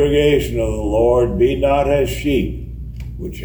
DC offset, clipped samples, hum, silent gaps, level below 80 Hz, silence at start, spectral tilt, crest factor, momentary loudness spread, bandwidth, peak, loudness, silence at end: under 0.1%; under 0.1%; none; none; -28 dBFS; 0 s; -6.5 dB/octave; 14 dB; 15 LU; over 20 kHz; -4 dBFS; -17 LUFS; 0 s